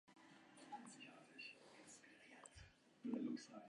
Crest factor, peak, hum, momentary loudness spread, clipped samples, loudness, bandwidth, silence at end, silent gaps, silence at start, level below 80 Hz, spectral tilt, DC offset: 20 dB; -34 dBFS; none; 18 LU; under 0.1%; -55 LUFS; 11 kHz; 0 s; none; 0.05 s; -80 dBFS; -4 dB/octave; under 0.1%